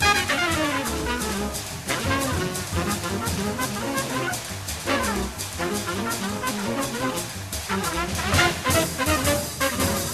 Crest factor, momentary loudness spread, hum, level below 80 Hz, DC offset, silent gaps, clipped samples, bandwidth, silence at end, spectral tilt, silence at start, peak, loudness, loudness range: 20 dB; 7 LU; none; -40 dBFS; under 0.1%; none; under 0.1%; 15 kHz; 0 s; -3.5 dB/octave; 0 s; -4 dBFS; -24 LUFS; 3 LU